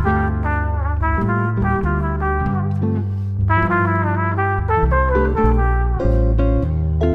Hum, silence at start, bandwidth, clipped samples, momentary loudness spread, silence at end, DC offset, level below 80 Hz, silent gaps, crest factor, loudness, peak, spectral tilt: none; 0 s; 4.1 kHz; under 0.1%; 4 LU; 0 s; under 0.1%; -22 dBFS; none; 14 dB; -19 LUFS; -2 dBFS; -10 dB/octave